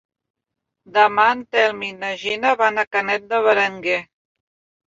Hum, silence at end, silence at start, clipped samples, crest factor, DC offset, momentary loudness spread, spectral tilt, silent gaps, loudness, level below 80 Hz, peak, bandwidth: none; 0.85 s; 0.95 s; under 0.1%; 18 dB; under 0.1%; 8 LU; -3.5 dB/octave; 2.87-2.91 s; -19 LUFS; -66 dBFS; -2 dBFS; 7.8 kHz